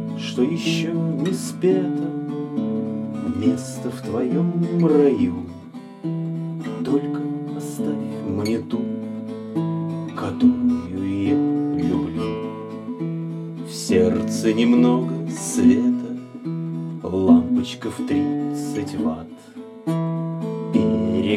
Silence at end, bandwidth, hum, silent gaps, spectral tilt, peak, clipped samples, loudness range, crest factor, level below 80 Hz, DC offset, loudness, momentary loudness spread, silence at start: 0 s; 13.5 kHz; none; none; -6.5 dB/octave; -2 dBFS; under 0.1%; 6 LU; 20 dB; -56 dBFS; under 0.1%; -22 LUFS; 13 LU; 0 s